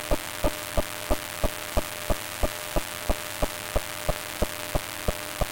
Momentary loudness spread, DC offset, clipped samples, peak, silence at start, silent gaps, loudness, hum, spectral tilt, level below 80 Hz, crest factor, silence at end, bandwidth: 2 LU; under 0.1%; under 0.1%; -8 dBFS; 0 s; none; -30 LUFS; none; -3.5 dB/octave; -34 dBFS; 20 dB; 0 s; 17 kHz